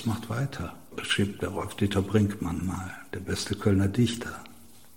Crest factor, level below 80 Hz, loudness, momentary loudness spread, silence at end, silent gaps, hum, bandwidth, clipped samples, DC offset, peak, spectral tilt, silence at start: 20 dB; -52 dBFS; -29 LUFS; 13 LU; 0.3 s; none; none; 17 kHz; under 0.1%; 0.3%; -8 dBFS; -5.5 dB/octave; 0 s